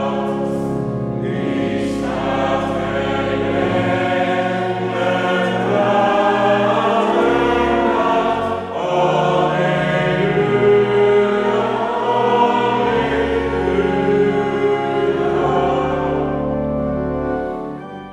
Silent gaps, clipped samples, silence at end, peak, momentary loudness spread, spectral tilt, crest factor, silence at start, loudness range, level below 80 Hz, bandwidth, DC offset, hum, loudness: none; under 0.1%; 0 s; -4 dBFS; 6 LU; -7 dB/octave; 14 dB; 0 s; 3 LU; -40 dBFS; 10.5 kHz; under 0.1%; none; -17 LUFS